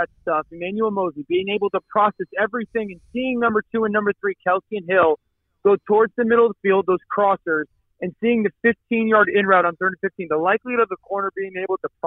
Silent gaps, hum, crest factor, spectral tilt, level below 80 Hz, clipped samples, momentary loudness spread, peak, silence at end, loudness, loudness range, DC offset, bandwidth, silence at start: none; none; 18 dB; -9 dB/octave; -60 dBFS; under 0.1%; 9 LU; -2 dBFS; 0 s; -20 LUFS; 3 LU; under 0.1%; 4 kHz; 0 s